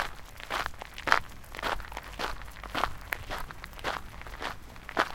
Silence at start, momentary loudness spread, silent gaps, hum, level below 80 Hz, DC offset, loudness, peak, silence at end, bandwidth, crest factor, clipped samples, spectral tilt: 0 s; 15 LU; none; none; -46 dBFS; under 0.1%; -34 LUFS; -2 dBFS; 0 s; 17 kHz; 32 dB; under 0.1%; -3 dB/octave